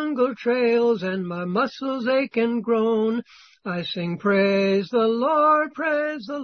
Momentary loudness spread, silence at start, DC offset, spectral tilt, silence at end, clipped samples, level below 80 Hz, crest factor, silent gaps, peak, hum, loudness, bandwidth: 9 LU; 0 s; under 0.1%; -7 dB/octave; 0 s; under 0.1%; -68 dBFS; 14 dB; none; -8 dBFS; none; -22 LUFS; 6.4 kHz